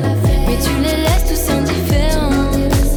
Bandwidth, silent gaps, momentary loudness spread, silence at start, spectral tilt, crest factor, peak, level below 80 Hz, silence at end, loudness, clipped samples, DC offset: over 20 kHz; none; 1 LU; 0 s; -5.5 dB/octave; 10 dB; -4 dBFS; -18 dBFS; 0 s; -16 LUFS; under 0.1%; under 0.1%